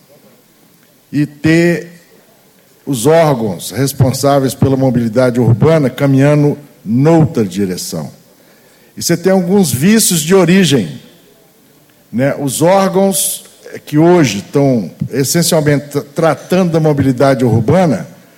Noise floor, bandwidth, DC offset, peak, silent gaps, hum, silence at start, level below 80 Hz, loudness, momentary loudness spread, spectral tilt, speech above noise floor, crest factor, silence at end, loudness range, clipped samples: -47 dBFS; 17 kHz; under 0.1%; 0 dBFS; none; none; 1.1 s; -46 dBFS; -12 LUFS; 11 LU; -5.5 dB/octave; 36 dB; 12 dB; 0.3 s; 3 LU; under 0.1%